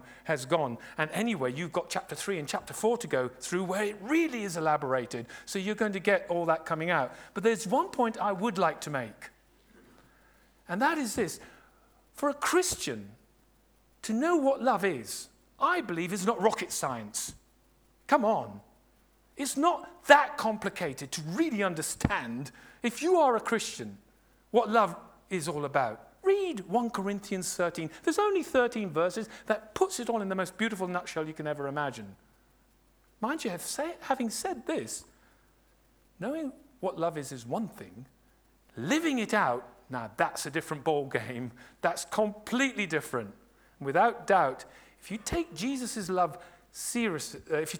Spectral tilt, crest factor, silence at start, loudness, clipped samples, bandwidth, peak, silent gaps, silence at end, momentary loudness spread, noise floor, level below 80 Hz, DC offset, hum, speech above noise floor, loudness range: -4 dB/octave; 28 dB; 0.05 s; -30 LUFS; under 0.1%; over 20 kHz; -4 dBFS; none; 0 s; 13 LU; -65 dBFS; -60 dBFS; under 0.1%; none; 35 dB; 7 LU